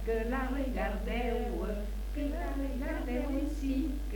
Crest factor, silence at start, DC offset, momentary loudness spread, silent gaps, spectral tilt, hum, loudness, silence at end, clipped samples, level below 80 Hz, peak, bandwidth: 12 dB; 0 s; under 0.1%; 3 LU; none; -7 dB/octave; none; -35 LUFS; 0 s; under 0.1%; -36 dBFS; -20 dBFS; 19 kHz